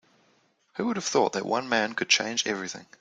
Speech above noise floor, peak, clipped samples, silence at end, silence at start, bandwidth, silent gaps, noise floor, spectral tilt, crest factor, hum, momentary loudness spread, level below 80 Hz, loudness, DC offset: 39 dB; -8 dBFS; under 0.1%; 0.2 s; 0.75 s; 11 kHz; none; -66 dBFS; -2 dB/octave; 22 dB; none; 10 LU; -74 dBFS; -26 LUFS; under 0.1%